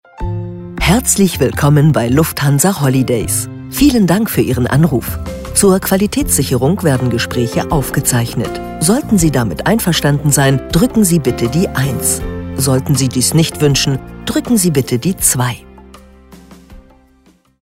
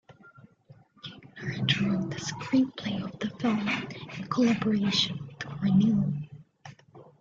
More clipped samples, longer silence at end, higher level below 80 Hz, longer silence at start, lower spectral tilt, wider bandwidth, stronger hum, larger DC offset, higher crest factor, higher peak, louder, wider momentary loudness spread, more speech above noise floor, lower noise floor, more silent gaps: neither; first, 0.8 s vs 0.2 s; first, -30 dBFS vs -62 dBFS; about the same, 0.2 s vs 0.1 s; about the same, -5 dB/octave vs -5.5 dB/octave; first, 16.5 kHz vs 7.6 kHz; neither; neither; about the same, 14 dB vs 18 dB; first, 0 dBFS vs -10 dBFS; first, -13 LUFS vs -28 LUFS; second, 8 LU vs 19 LU; first, 38 dB vs 30 dB; second, -51 dBFS vs -57 dBFS; neither